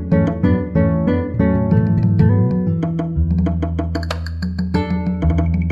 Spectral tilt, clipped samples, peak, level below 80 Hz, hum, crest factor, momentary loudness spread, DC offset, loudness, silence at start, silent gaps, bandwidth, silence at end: -9.5 dB/octave; under 0.1%; -2 dBFS; -28 dBFS; none; 14 dB; 8 LU; under 0.1%; -18 LUFS; 0 s; none; 7.6 kHz; 0 s